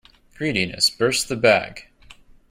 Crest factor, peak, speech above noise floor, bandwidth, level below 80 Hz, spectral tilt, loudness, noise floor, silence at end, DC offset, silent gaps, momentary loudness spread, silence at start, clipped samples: 20 dB; -4 dBFS; 27 dB; 16 kHz; -52 dBFS; -3 dB/octave; -20 LUFS; -48 dBFS; 0.4 s; under 0.1%; none; 9 LU; 0.4 s; under 0.1%